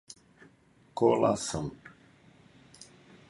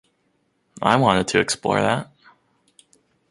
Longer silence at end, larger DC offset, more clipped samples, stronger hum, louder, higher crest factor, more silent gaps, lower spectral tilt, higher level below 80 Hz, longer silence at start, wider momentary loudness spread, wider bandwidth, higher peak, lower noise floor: second, 0.45 s vs 1.25 s; neither; neither; neither; second, -28 LUFS vs -20 LUFS; about the same, 22 dB vs 22 dB; neither; about the same, -5.5 dB/octave vs -4.5 dB/octave; second, -60 dBFS vs -54 dBFS; first, 0.95 s vs 0.75 s; first, 27 LU vs 9 LU; about the same, 11.5 kHz vs 11.5 kHz; second, -12 dBFS vs 0 dBFS; second, -62 dBFS vs -68 dBFS